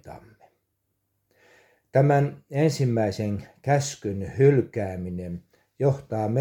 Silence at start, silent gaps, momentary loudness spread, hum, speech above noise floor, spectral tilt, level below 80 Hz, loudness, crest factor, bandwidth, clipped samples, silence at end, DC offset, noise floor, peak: 0.05 s; none; 13 LU; none; 52 dB; -7 dB/octave; -58 dBFS; -25 LUFS; 18 dB; 12 kHz; under 0.1%; 0 s; under 0.1%; -76 dBFS; -6 dBFS